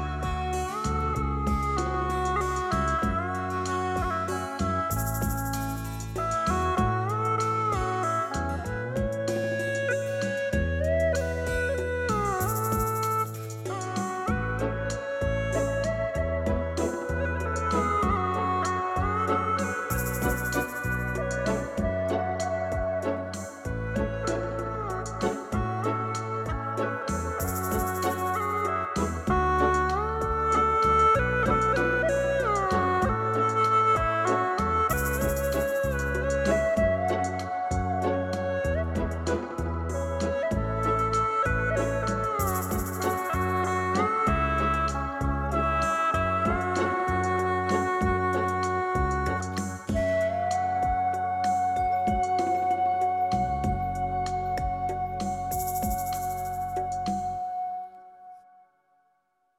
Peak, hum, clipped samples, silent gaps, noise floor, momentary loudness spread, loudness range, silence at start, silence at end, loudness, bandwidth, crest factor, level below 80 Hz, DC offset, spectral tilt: -12 dBFS; none; under 0.1%; none; -71 dBFS; 6 LU; 6 LU; 0 s; 1.2 s; -27 LUFS; 16.5 kHz; 16 dB; -38 dBFS; under 0.1%; -5.5 dB/octave